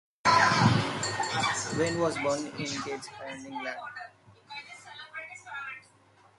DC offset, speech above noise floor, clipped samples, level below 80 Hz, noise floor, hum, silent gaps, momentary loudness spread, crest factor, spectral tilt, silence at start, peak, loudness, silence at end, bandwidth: under 0.1%; 28 dB; under 0.1%; -60 dBFS; -61 dBFS; none; none; 21 LU; 20 dB; -4 dB/octave; 0.25 s; -10 dBFS; -28 LUFS; 0.6 s; 11.5 kHz